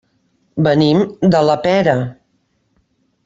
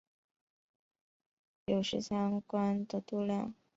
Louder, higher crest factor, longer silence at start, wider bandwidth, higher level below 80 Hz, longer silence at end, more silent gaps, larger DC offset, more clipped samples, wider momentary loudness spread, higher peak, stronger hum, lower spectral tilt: first, -14 LUFS vs -35 LUFS; about the same, 16 dB vs 18 dB; second, 0.55 s vs 1.7 s; about the same, 7.8 kHz vs 7.6 kHz; first, -52 dBFS vs -70 dBFS; first, 1.15 s vs 0.25 s; neither; neither; neither; first, 9 LU vs 4 LU; first, 0 dBFS vs -20 dBFS; neither; first, -7.5 dB/octave vs -6 dB/octave